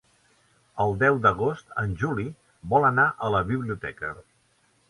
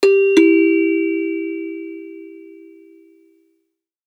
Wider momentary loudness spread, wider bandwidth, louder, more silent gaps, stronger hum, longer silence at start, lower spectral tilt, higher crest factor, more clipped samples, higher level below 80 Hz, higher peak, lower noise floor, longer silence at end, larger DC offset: second, 15 LU vs 23 LU; about the same, 11.5 kHz vs 10.5 kHz; second, -25 LUFS vs -16 LUFS; neither; neither; first, 0.75 s vs 0 s; first, -7.5 dB/octave vs -3.5 dB/octave; about the same, 20 dB vs 18 dB; neither; first, -50 dBFS vs -84 dBFS; second, -6 dBFS vs 0 dBFS; second, -65 dBFS vs -72 dBFS; second, 0.7 s vs 1.65 s; neither